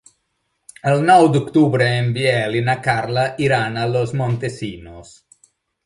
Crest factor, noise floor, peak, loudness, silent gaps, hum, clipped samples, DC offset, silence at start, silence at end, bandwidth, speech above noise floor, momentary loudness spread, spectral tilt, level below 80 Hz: 18 dB; -71 dBFS; 0 dBFS; -17 LUFS; none; none; under 0.1%; under 0.1%; 0.85 s; 0.85 s; 11.5 kHz; 54 dB; 12 LU; -6.5 dB/octave; -52 dBFS